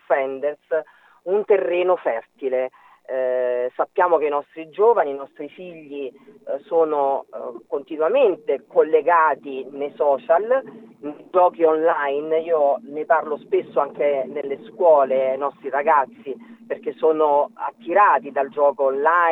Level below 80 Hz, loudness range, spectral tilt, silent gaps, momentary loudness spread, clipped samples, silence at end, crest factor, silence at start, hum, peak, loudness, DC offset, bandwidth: -86 dBFS; 3 LU; -7 dB/octave; none; 15 LU; under 0.1%; 0 s; 16 dB; 0.1 s; none; -4 dBFS; -20 LUFS; under 0.1%; 4 kHz